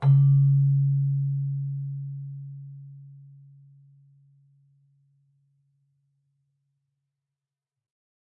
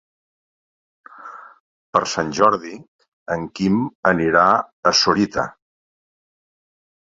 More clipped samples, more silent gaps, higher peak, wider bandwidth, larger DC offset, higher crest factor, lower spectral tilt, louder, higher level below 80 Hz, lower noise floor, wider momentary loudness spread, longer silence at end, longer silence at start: neither; second, none vs 1.60-1.93 s, 2.88-2.99 s, 3.08-3.26 s, 3.95-4.03 s, 4.73-4.83 s; second, -12 dBFS vs -2 dBFS; second, 1.7 kHz vs 7.8 kHz; neither; about the same, 16 dB vs 20 dB; first, -12.5 dB/octave vs -4 dB/octave; second, -24 LUFS vs -18 LUFS; second, -62 dBFS vs -54 dBFS; first, -89 dBFS vs -39 dBFS; first, 25 LU vs 16 LU; first, 5.15 s vs 1.7 s; second, 0 s vs 1.2 s